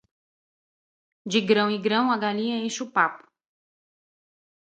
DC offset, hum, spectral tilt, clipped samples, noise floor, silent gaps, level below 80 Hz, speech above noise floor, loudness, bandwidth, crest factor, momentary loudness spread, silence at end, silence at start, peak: under 0.1%; none; -4 dB/octave; under 0.1%; under -90 dBFS; none; -76 dBFS; over 66 dB; -24 LUFS; 9 kHz; 22 dB; 6 LU; 1.55 s; 1.25 s; -6 dBFS